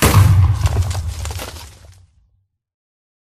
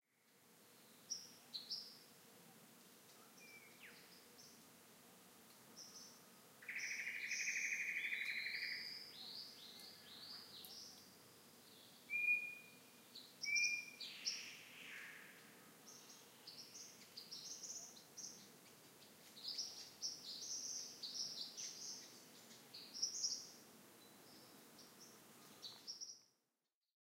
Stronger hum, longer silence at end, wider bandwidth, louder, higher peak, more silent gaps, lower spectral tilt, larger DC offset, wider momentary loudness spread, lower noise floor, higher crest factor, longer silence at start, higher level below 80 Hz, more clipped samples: neither; first, 1.6 s vs 0.85 s; about the same, 15.5 kHz vs 16 kHz; first, -16 LUFS vs -46 LUFS; first, 0 dBFS vs -28 dBFS; neither; first, -5 dB/octave vs 1 dB/octave; neither; second, 19 LU vs 22 LU; second, -62 dBFS vs under -90 dBFS; second, 16 dB vs 24 dB; second, 0 s vs 0.25 s; first, -26 dBFS vs under -90 dBFS; neither